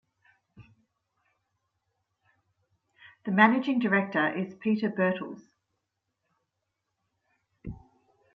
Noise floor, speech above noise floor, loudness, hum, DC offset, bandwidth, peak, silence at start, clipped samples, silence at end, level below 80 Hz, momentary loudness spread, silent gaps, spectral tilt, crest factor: -83 dBFS; 56 dB; -26 LUFS; none; under 0.1%; 6.2 kHz; -6 dBFS; 0.6 s; under 0.1%; 0.55 s; -64 dBFS; 23 LU; none; -8 dB/octave; 26 dB